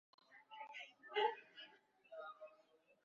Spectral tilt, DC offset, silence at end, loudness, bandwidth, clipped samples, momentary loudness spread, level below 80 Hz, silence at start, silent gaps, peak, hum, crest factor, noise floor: 2.5 dB/octave; under 0.1%; 0.5 s; -46 LUFS; 7.2 kHz; under 0.1%; 21 LU; under -90 dBFS; 0.3 s; none; -26 dBFS; none; 24 dB; -74 dBFS